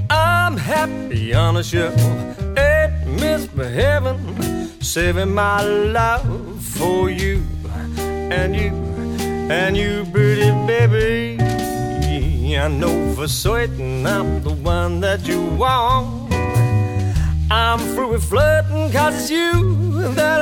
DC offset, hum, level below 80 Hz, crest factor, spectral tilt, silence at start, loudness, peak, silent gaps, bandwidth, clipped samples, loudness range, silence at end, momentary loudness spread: under 0.1%; none; -26 dBFS; 14 dB; -5.5 dB/octave; 0 s; -18 LUFS; -2 dBFS; none; 18.5 kHz; under 0.1%; 3 LU; 0 s; 8 LU